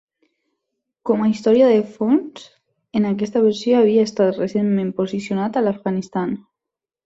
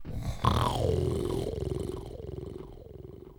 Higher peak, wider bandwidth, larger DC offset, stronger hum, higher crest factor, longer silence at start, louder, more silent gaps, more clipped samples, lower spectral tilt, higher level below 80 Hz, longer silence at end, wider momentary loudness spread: first, -4 dBFS vs -10 dBFS; second, 7.8 kHz vs 19 kHz; neither; neither; second, 16 dB vs 22 dB; first, 1.05 s vs 0 s; first, -19 LUFS vs -32 LUFS; neither; neither; about the same, -7 dB/octave vs -6.5 dB/octave; second, -62 dBFS vs -40 dBFS; first, 0.65 s vs 0.05 s; second, 10 LU vs 19 LU